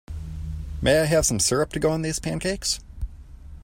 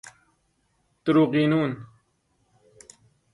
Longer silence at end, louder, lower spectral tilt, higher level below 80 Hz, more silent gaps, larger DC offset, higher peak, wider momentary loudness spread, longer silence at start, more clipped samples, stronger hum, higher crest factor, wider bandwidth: second, 0 s vs 1.5 s; about the same, -23 LUFS vs -23 LUFS; second, -4 dB/octave vs -7 dB/octave; first, -36 dBFS vs -66 dBFS; neither; neither; first, -6 dBFS vs -10 dBFS; first, 17 LU vs 12 LU; about the same, 0.1 s vs 0.05 s; neither; neither; about the same, 18 dB vs 18 dB; first, 16.5 kHz vs 11 kHz